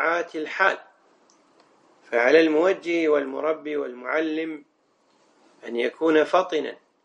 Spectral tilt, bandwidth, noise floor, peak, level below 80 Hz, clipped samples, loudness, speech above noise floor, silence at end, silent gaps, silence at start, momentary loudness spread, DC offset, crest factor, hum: -4.5 dB/octave; 8.8 kHz; -65 dBFS; -4 dBFS; -80 dBFS; under 0.1%; -23 LUFS; 42 dB; 0.3 s; none; 0 s; 15 LU; under 0.1%; 20 dB; none